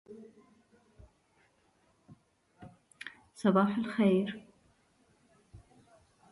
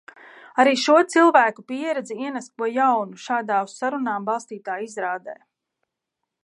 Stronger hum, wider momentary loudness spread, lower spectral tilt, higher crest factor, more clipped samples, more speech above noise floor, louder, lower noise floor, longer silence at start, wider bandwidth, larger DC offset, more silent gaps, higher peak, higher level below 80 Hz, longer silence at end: neither; first, 28 LU vs 14 LU; first, -7.5 dB/octave vs -3.5 dB/octave; about the same, 22 dB vs 20 dB; neither; second, 42 dB vs 61 dB; second, -30 LUFS vs -21 LUFS; second, -70 dBFS vs -82 dBFS; second, 0.1 s vs 0.55 s; about the same, 11.5 kHz vs 11.5 kHz; neither; neither; second, -14 dBFS vs -2 dBFS; first, -70 dBFS vs -82 dBFS; second, 0.75 s vs 1.1 s